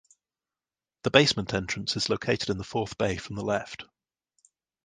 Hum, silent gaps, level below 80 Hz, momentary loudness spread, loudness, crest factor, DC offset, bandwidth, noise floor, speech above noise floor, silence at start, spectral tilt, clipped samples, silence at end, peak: none; none; -54 dBFS; 12 LU; -27 LUFS; 26 dB; under 0.1%; 10 kHz; under -90 dBFS; over 63 dB; 1.05 s; -4 dB/octave; under 0.1%; 1 s; -4 dBFS